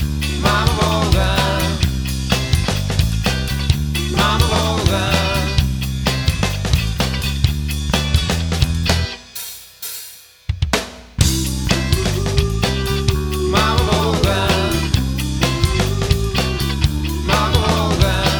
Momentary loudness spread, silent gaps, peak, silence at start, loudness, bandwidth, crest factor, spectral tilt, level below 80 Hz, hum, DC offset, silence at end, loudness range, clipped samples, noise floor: 6 LU; none; 0 dBFS; 0 s; -18 LUFS; over 20 kHz; 18 dB; -4.5 dB/octave; -22 dBFS; none; under 0.1%; 0 s; 4 LU; under 0.1%; -38 dBFS